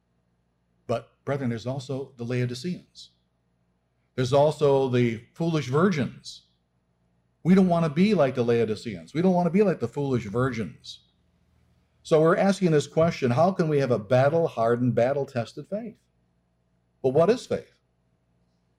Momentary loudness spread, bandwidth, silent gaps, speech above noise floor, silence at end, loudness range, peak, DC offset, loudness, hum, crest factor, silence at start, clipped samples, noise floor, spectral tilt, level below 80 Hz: 13 LU; 11.5 kHz; none; 47 dB; 1.15 s; 7 LU; -10 dBFS; under 0.1%; -24 LUFS; none; 14 dB; 0.9 s; under 0.1%; -71 dBFS; -7.5 dB/octave; -62 dBFS